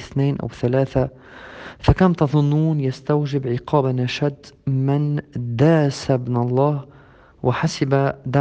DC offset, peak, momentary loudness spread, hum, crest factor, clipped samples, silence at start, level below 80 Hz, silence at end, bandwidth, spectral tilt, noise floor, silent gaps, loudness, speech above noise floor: under 0.1%; 0 dBFS; 9 LU; none; 20 dB; under 0.1%; 0 s; -40 dBFS; 0 s; 8.6 kHz; -7.5 dB/octave; -48 dBFS; none; -20 LUFS; 29 dB